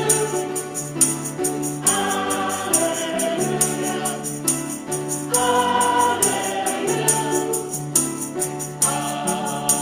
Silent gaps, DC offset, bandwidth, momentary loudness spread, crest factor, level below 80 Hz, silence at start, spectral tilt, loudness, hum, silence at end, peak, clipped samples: none; under 0.1%; 16 kHz; 7 LU; 20 dB; -60 dBFS; 0 s; -2.5 dB/octave; -20 LUFS; none; 0 s; -2 dBFS; under 0.1%